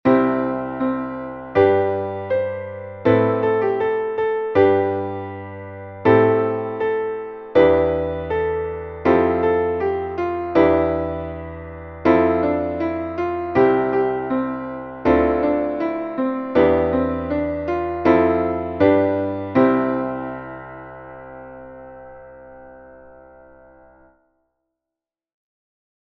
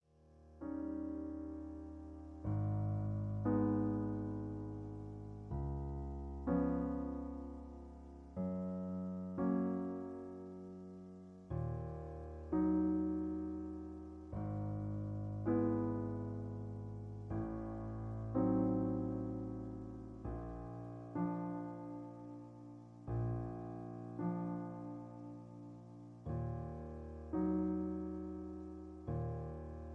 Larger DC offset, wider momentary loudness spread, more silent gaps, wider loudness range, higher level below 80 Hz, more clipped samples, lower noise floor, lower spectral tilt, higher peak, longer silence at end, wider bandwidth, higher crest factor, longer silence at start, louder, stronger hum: neither; about the same, 17 LU vs 15 LU; neither; about the same, 3 LU vs 5 LU; first, -44 dBFS vs -54 dBFS; neither; first, -88 dBFS vs -64 dBFS; second, -9.5 dB/octave vs -11.5 dB/octave; first, -2 dBFS vs -24 dBFS; first, 3.05 s vs 0 s; first, 6 kHz vs 3 kHz; about the same, 18 dB vs 18 dB; second, 0.05 s vs 0.25 s; first, -20 LUFS vs -42 LUFS; neither